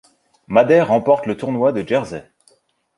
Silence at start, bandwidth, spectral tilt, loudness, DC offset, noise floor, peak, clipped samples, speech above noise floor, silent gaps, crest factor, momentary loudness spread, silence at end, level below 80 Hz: 0.5 s; 11 kHz; -7 dB/octave; -17 LUFS; under 0.1%; -58 dBFS; -2 dBFS; under 0.1%; 42 dB; none; 16 dB; 10 LU; 0.75 s; -56 dBFS